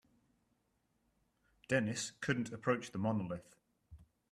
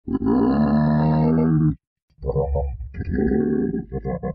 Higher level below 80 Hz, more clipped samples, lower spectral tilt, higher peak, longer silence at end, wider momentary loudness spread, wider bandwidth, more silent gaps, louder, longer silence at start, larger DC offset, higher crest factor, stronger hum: second, -70 dBFS vs -34 dBFS; neither; second, -5 dB/octave vs -9.5 dB/octave; second, -20 dBFS vs -8 dBFS; first, 0.3 s vs 0 s; second, 5 LU vs 11 LU; first, 13.5 kHz vs 5 kHz; second, none vs 1.87-1.96 s, 2.02-2.08 s; second, -38 LUFS vs -21 LUFS; first, 1.7 s vs 0.05 s; neither; first, 22 dB vs 12 dB; neither